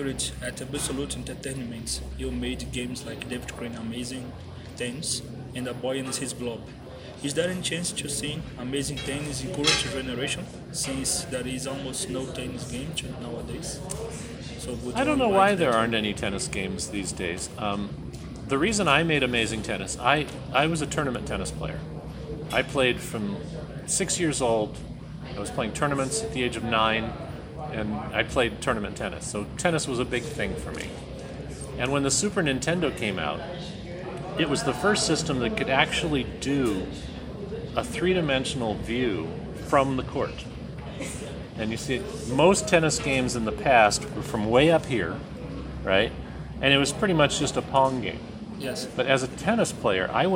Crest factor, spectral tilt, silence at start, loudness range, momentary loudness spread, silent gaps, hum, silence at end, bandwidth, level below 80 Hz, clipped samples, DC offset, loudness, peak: 22 dB; -4 dB/octave; 0 s; 8 LU; 14 LU; none; none; 0 s; 16.5 kHz; -44 dBFS; under 0.1%; under 0.1%; -26 LUFS; -4 dBFS